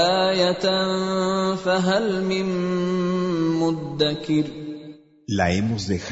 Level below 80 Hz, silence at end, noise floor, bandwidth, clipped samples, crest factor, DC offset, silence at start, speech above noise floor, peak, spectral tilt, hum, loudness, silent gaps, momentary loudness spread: -52 dBFS; 0 s; -43 dBFS; 8 kHz; under 0.1%; 16 dB; under 0.1%; 0 s; 21 dB; -6 dBFS; -5.5 dB/octave; none; -22 LUFS; none; 7 LU